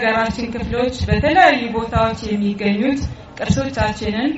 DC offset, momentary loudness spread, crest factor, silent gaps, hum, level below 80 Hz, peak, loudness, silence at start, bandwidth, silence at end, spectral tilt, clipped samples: under 0.1%; 10 LU; 18 dB; none; none; -32 dBFS; 0 dBFS; -18 LUFS; 0 s; 8 kHz; 0 s; -4.5 dB/octave; under 0.1%